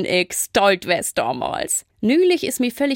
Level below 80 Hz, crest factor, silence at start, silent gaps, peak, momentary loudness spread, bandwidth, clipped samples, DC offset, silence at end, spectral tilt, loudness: -54 dBFS; 16 dB; 0 s; none; -4 dBFS; 6 LU; 16.5 kHz; under 0.1%; under 0.1%; 0 s; -3 dB/octave; -19 LUFS